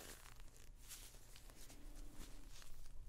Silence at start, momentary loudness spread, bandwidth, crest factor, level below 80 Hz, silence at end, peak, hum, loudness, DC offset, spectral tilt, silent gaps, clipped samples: 0 s; 6 LU; 16 kHz; 14 dB; -56 dBFS; 0 s; -38 dBFS; none; -60 LUFS; under 0.1%; -2.5 dB/octave; none; under 0.1%